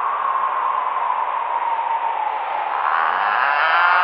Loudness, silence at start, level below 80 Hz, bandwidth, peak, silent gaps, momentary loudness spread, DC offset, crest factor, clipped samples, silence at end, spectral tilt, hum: -19 LUFS; 0 s; -78 dBFS; 5.6 kHz; -2 dBFS; none; 6 LU; under 0.1%; 18 dB; under 0.1%; 0 s; -3.5 dB/octave; none